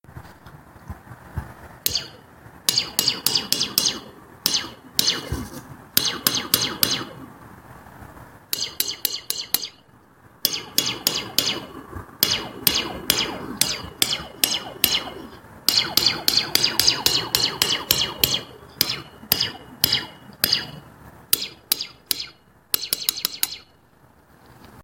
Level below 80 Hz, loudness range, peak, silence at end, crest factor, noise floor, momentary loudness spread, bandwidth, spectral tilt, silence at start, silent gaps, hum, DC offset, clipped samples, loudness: -50 dBFS; 6 LU; 0 dBFS; 0 s; 24 dB; -55 dBFS; 17 LU; 17 kHz; -1 dB/octave; 0.1 s; none; none; under 0.1%; under 0.1%; -21 LUFS